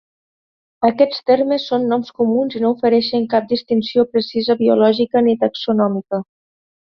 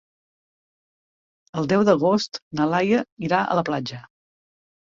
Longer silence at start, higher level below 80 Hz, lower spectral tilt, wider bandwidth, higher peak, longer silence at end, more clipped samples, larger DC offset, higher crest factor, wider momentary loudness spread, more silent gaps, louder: second, 0.8 s vs 1.55 s; about the same, -60 dBFS vs -62 dBFS; first, -7.5 dB/octave vs -6 dB/octave; second, 6.2 kHz vs 7.6 kHz; about the same, -2 dBFS vs -4 dBFS; second, 0.65 s vs 0.85 s; neither; neither; about the same, 16 dB vs 20 dB; second, 4 LU vs 12 LU; second, none vs 2.42-2.51 s, 3.12-3.17 s; first, -17 LUFS vs -22 LUFS